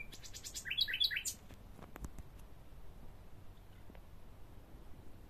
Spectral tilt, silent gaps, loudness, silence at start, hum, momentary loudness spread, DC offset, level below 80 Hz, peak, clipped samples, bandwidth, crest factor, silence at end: -0.5 dB/octave; none; -38 LUFS; 0 s; none; 25 LU; under 0.1%; -56 dBFS; -20 dBFS; under 0.1%; 14.5 kHz; 24 dB; 0 s